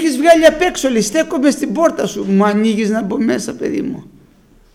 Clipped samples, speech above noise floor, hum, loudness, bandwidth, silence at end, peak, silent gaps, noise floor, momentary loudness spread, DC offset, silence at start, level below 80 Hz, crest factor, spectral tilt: under 0.1%; 34 dB; none; -14 LUFS; 16.5 kHz; 0.7 s; 0 dBFS; none; -48 dBFS; 11 LU; under 0.1%; 0 s; -46 dBFS; 14 dB; -4.5 dB/octave